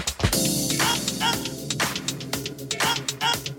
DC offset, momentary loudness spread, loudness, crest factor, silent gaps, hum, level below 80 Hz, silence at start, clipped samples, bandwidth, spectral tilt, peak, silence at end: under 0.1%; 8 LU; -24 LUFS; 20 dB; none; none; -44 dBFS; 0 s; under 0.1%; 19 kHz; -2.5 dB/octave; -6 dBFS; 0 s